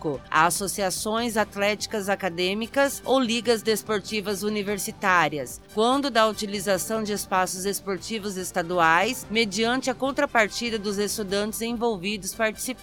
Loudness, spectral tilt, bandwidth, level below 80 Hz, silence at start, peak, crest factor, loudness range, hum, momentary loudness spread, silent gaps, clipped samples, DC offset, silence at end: -24 LUFS; -3 dB/octave; 19 kHz; -54 dBFS; 0 s; -6 dBFS; 20 dB; 1 LU; none; 7 LU; none; under 0.1%; under 0.1%; 0 s